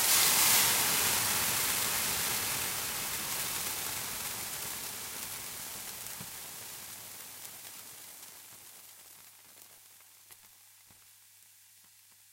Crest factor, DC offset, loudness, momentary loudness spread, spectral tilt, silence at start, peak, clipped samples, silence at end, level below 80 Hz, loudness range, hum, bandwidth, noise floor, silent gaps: 24 dB; under 0.1%; -29 LUFS; 24 LU; 0 dB/octave; 0 s; -10 dBFS; under 0.1%; 1.4 s; -64 dBFS; 24 LU; none; 16 kHz; -60 dBFS; none